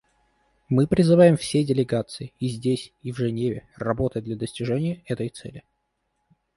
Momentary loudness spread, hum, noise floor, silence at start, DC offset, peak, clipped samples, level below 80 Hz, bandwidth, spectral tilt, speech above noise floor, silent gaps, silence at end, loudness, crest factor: 15 LU; none; -75 dBFS; 0.7 s; under 0.1%; -4 dBFS; under 0.1%; -52 dBFS; 11.5 kHz; -7 dB/octave; 52 dB; none; 0.95 s; -23 LUFS; 20 dB